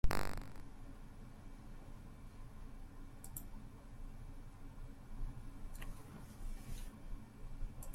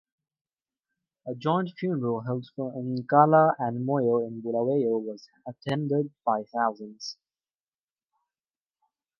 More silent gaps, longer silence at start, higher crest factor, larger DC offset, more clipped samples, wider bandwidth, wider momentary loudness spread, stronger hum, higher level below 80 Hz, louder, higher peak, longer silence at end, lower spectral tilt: neither; second, 0.05 s vs 1.25 s; about the same, 24 dB vs 24 dB; neither; neither; first, 16.5 kHz vs 7 kHz; second, 6 LU vs 18 LU; neither; first, -46 dBFS vs -76 dBFS; second, -53 LUFS vs -26 LUFS; second, -18 dBFS vs -6 dBFS; second, 0 s vs 2.05 s; second, -5 dB/octave vs -7.5 dB/octave